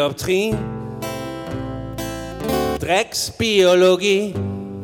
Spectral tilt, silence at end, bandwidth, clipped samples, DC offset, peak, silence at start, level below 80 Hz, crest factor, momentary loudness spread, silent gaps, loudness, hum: -4.5 dB/octave; 0 s; 19.5 kHz; under 0.1%; under 0.1%; -6 dBFS; 0 s; -42 dBFS; 14 dB; 14 LU; none; -20 LUFS; none